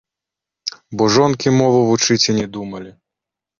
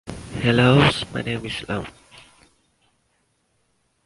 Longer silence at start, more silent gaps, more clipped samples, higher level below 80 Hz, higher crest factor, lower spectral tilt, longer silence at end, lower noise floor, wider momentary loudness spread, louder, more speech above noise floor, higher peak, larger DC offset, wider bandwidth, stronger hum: first, 0.65 s vs 0.05 s; neither; neither; second, -52 dBFS vs -46 dBFS; second, 16 dB vs 22 dB; second, -4.5 dB/octave vs -6 dB/octave; second, 0.7 s vs 2.15 s; first, -85 dBFS vs -68 dBFS; about the same, 15 LU vs 16 LU; first, -15 LUFS vs -20 LUFS; first, 70 dB vs 48 dB; about the same, -2 dBFS vs -2 dBFS; neither; second, 7.4 kHz vs 11.5 kHz; neither